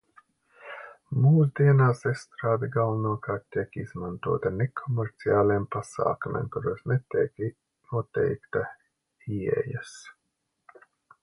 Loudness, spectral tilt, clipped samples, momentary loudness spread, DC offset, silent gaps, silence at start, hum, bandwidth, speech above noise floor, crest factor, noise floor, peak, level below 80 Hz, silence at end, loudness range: -27 LUFS; -8.5 dB/octave; under 0.1%; 15 LU; under 0.1%; none; 0.65 s; none; 11 kHz; 53 dB; 16 dB; -79 dBFS; -10 dBFS; -58 dBFS; 1.1 s; 7 LU